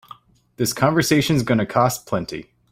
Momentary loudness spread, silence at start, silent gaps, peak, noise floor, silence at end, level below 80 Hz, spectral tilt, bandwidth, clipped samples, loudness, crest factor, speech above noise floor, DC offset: 9 LU; 0.6 s; none; -4 dBFS; -46 dBFS; 0.3 s; -50 dBFS; -5 dB/octave; 16 kHz; under 0.1%; -20 LUFS; 18 dB; 27 dB; under 0.1%